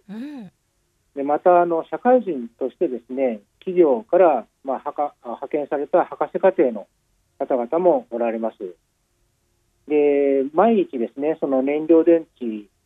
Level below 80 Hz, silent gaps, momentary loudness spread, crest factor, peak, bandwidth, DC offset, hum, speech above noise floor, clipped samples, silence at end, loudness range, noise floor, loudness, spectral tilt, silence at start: -72 dBFS; none; 14 LU; 16 dB; -4 dBFS; 4.1 kHz; under 0.1%; none; 48 dB; under 0.1%; 0.25 s; 4 LU; -68 dBFS; -20 LUFS; -9 dB/octave; 0.1 s